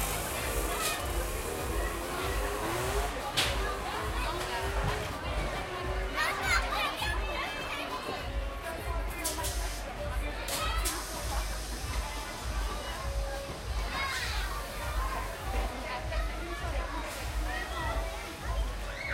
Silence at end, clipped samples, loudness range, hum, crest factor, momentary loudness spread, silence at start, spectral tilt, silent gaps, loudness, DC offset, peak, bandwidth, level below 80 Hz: 0 s; under 0.1%; 4 LU; none; 18 dB; 6 LU; 0 s; -3.5 dB/octave; none; -34 LUFS; under 0.1%; -14 dBFS; 16 kHz; -38 dBFS